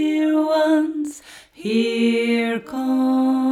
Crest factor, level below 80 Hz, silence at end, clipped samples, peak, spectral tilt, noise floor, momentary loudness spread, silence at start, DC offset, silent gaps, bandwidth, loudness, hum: 12 dB; -66 dBFS; 0 s; under 0.1%; -6 dBFS; -5 dB/octave; -42 dBFS; 11 LU; 0 s; under 0.1%; none; 14 kHz; -20 LUFS; none